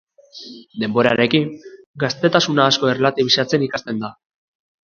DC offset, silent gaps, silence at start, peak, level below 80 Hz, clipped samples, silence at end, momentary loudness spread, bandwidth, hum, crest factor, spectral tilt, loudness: under 0.1%; 1.86-1.94 s; 0.35 s; 0 dBFS; -60 dBFS; under 0.1%; 0.75 s; 19 LU; 7.2 kHz; none; 20 dB; -4.5 dB/octave; -18 LUFS